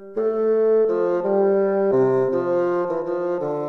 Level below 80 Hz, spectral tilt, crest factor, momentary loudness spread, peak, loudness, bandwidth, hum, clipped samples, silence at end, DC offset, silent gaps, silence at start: -62 dBFS; -9.5 dB/octave; 12 dB; 6 LU; -8 dBFS; -20 LUFS; 5.8 kHz; none; under 0.1%; 0 s; under 0.1%; none; 0 s